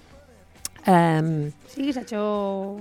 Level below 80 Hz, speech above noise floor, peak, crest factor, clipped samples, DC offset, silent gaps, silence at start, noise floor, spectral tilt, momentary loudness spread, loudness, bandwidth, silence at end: -58 dBFS; 28 dB; -4 dBFS; 20 dB; under 0.1%; under 0.1%; none; 0.65 s; -50 dBFS; -6.5 dB/octave; 14 LU; -24 LUFS; 17.5 kHz; 0 s